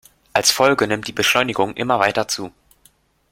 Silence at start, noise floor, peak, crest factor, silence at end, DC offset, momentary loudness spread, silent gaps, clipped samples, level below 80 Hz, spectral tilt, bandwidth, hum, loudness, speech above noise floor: 0.35 s; -57 dBFS; -2 dBFS; 18 dB; 0.8 s; under 0.1%; 9 LU; none; under 0.1%; -54 dBFS; -2.5 dB/octave; 16.5 kHz; none; -18 LUFS; 39 dB